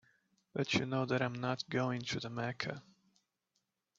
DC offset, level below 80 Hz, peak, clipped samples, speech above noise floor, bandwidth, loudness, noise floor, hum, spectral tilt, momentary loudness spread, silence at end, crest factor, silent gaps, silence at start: under 0.1%; -74 dBFS; -18 dBFS; under 0.1%; 48 dB; 7.8 kHz; -37 LUFS; -84 dBFS; none; -4 dB/octave; 8 LU; 1.15 s; 20 dB; none; 0.55 s